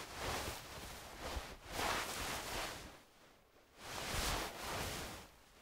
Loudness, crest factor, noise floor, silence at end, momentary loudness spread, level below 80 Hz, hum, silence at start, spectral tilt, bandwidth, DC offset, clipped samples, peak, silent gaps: -43 LUFS; 18 dB; -66 dBFS; 0 s; 14 LU; -54 dBFS; none; 0 s; -2.5 dB/octave; 16 kHz; under 0.1%; under 0.1%; -26 dBFS; none